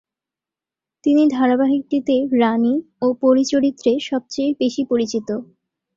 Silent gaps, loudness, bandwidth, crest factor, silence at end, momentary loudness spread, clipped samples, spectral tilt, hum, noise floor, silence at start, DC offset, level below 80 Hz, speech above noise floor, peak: none; -18 LUFS; 7.6 kHz; 16 dB; 0.5 s; 7 LU; under 0.1%; -5 dB/octave; none; -88 dBFS; 1.05 s; under 0.1%; -62 dBFS; 71 dB; -4 dBFS